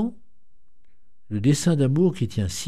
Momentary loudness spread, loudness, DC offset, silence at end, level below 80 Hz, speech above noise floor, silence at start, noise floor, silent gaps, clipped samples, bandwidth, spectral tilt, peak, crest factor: 9 LU; -22 LUFS; 1%; 0 s; -50 dBFS; 41 dB; 0 s; -63 dBFS; none; under 0.1%; 14.5 kHz; -6.5 dB/octave; -8 dBFS; 16 dB